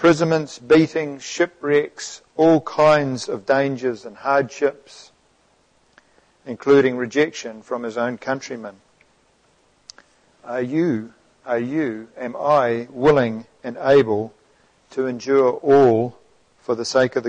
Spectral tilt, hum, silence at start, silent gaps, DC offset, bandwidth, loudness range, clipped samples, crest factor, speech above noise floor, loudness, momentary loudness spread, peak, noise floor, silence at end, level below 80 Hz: -5.5 dB/octave; none; 0 s; none; under 0.1%; 9.2 kHz; 9 LU; under 0.1%; 16 dB; 41 dB; -20 LUFS; 15 LU; -4 dBFS; -60 dBFS; 0 s; -60 dBFS